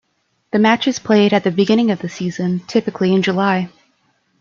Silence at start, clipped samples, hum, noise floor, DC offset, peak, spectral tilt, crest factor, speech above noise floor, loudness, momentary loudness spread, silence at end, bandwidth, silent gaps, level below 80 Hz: 0.55 s; under 0.1%; none; -66 dBFS; under 0.1%; -2 dBFS; -6 dB/octave; 16 dB; 51 dB; -16 LUFS; 8 LU; 0.75 s; 7.4 kHz; none; -60 dBFS